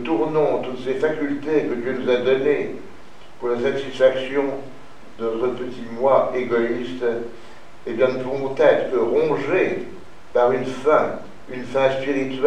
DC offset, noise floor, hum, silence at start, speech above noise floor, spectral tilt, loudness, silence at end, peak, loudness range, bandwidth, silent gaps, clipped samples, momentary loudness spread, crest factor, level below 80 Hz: 2%; -45 dBFS; none; 0 s; 24 dB; -6.5 dB/octave; -21 LUFS; 0 s; -2 dBFS; 3 LU; 9.8 kHz; none; under 0.1%; 13 LU; 18 dB; -56 dBFS